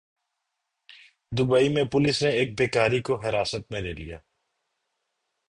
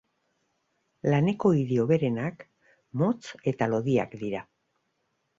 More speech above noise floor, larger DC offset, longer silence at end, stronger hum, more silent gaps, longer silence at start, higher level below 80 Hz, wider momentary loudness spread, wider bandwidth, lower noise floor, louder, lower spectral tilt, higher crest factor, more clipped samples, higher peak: first, 57 dB vs 50 dB; neither; first, 1.3 s vs 0.95 s; neither; neither; first, 1.3 s vs 1.05 s; first, -52 dBFS vs -64 dBFS; about the same, 13 LU vs 11 LU; first, 11.5 kHz vs 7.8 kHz; first, -81 dBFS vs -76 dBFS; first, -24 LUFS vs -27 LUFS; second, -5.5 dB/octave vs -8 dB/octave; about the same, 18 dB vs 18 dB; neither; about the same, -8 dBFS vs -10 dBFS